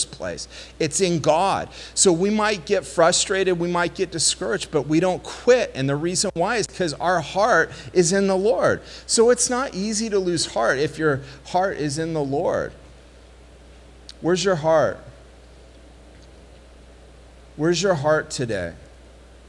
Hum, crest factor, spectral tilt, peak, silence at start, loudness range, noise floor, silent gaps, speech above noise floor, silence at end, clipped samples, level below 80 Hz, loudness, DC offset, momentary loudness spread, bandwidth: none; 18 dB; -3.5 dB/octave; -4 dBFS; 0 s; 6 LU; -46 dBFS; none; 25 dB; 0.65 s; under 0.1%; -48 dBFS; -21 LUFS; under 0.1%; 9 LU; 12 kHz